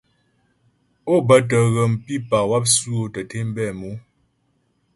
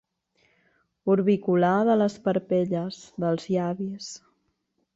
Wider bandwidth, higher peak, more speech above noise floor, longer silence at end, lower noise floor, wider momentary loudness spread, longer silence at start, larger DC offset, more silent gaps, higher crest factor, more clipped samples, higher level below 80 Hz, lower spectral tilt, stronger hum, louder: first, 11.5 kHz vs 8 kHz; first, -2 dBFS vs -10 dBFS; about the same, 47 dB vs 50 dB; first, 0.95 s vs 0.8 s; second, -66 dBFS vs -74 dBFS; first, 17 LU vs 13 LU; about the same, 1.05 s vs 1.05 s; neither; neither; about the same, 20 dB vs 16 dB; neither; first, -54 dBFS vs -68 dBFS; second, -4.5 dB/octave vs -7 dB/octave; neither; first, -19 LUFS vs -25 LUFS